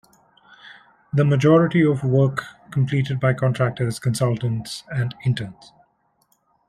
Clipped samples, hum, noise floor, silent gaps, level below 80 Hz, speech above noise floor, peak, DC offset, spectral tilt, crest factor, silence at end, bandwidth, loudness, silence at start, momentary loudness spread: under 0.1%; none; -65 dBFS; none; -56 dBFS; 45 dB; -4 dBFS; under 0.1%; -7 dB/octave; 18 dB; 1.15 s; 12.5 kHz; -21 LUFS; 0.65 s; 12 LU